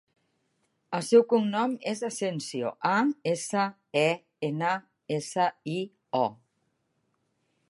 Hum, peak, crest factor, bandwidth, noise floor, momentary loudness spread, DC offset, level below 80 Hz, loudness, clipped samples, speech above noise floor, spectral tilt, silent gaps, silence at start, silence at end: none; -8 dBFS; 20 dB; 11.5 kHz; -75 dBFS; 11 LU; under 0.1%; -80 dBFS; -28 LUFS; under 0.1%; 48 dB; -5 dB/octave; none; 0.9 s; 1.35 s